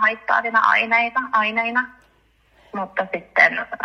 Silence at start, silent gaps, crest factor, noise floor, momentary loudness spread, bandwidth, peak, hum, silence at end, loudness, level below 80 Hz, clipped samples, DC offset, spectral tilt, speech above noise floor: 0 s; none; 20 dB; -59 dBFS; 11 LU; 8.8 kHz; 0 dBFS; none; 0 s; -18 LUFS; -62 dBFS; under 0.1%; under 0.1%; -4 dB/octave; 39 dB